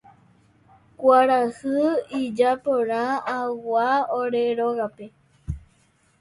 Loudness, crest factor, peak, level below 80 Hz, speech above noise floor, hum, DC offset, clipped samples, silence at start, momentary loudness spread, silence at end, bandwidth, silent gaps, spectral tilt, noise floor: -22 LUFS; 18 dB; -4 dBFS; -48 dBFS; 40 dB; none; under 0.1%; under 0.1%; 1 s; 16 LU; 0.6 s; 11.5 kHz; none; -6 dB/octave; -62 dBFS